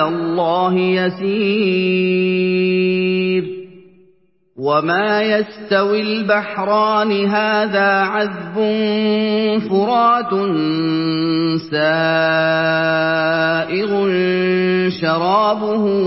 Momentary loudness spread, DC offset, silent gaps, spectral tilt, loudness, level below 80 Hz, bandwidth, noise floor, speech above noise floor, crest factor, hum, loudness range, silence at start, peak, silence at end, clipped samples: 4 LU; 0.1%; none; -10 dB/octave; -16 LUFS; -62 dBFS; 5.8 kHz; -57 dBFS; 41 dB; 14 dB; none; 2 LU; 0 s; -2 dBFS; 0 s; under 0.1%